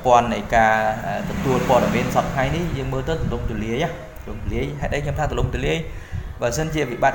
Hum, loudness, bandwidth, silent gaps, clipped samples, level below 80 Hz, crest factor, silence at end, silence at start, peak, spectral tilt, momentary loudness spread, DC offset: none; -22 LUFS; 17 kHz; none; under 0.1%; -32 dBFS; 20 dB; 0 s; 0 s; -2 dBFS; -5.5 dB/octave; 10 LU; 0.1%